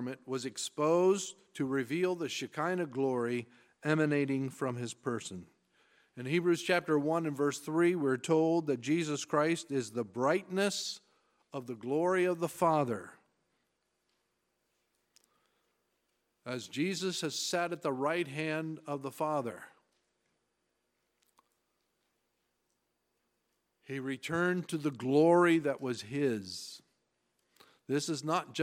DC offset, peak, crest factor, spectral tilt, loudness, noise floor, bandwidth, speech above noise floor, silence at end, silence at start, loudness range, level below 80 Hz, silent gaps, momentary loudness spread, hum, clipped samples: under 0.1%; -14 dBFS; 20 dB; -5 dB/octave; -33 LUFS; -81 dBFS; 16 kHz; 49 dB; 0 s; 0 s; 10 LU; -82 dBFS; none; 12 LU; 60 Hz at -65 dBFS; under 0.1%